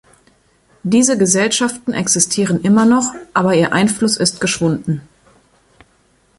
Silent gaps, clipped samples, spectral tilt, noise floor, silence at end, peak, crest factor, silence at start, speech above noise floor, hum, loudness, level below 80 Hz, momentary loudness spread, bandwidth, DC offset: none; under 0.1%; -4 dB/octave; -56 dBFS; 1.4 s; 0 dBFS; 16 dB; 0.85 s; 41 dB; none; -15 LUFS; -52 dBFS; 7 LU; 11.5 kHz; under 0.1%